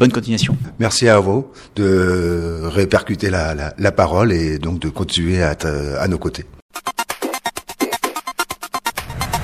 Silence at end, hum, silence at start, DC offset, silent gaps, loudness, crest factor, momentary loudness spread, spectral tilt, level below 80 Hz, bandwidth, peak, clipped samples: 0 s; none; 0 s; under 0.1%; 6.62-6.69 s; -18 LUFS; 18 dB; 9 LU; -5 dB/octave; -34 dBFS; 15.5 kHz; 0 dBFS; under 0.1%